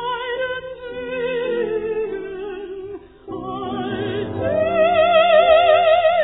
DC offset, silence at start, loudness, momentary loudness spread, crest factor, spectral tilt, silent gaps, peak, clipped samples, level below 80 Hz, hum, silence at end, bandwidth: under 0.1%; 0 s; -18 LUFS; 19 LU; 16 dB; -8.5 dB/octave; none; -2 dBFS; under 0.1%; -50 dBFS; none; 0 s; 4 kHz